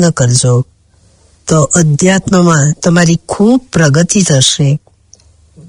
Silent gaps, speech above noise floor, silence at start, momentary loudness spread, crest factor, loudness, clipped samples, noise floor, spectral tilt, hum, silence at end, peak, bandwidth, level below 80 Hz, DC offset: none; 39 dB; 0 s; 6 LU; 10 dB; -9 LUFS; 0.2%; -48 dBFS; -4.5 dB/octave; none; 0.9 s; 0 dBFS; 11 kHz; -40 dBFS; under 0.1%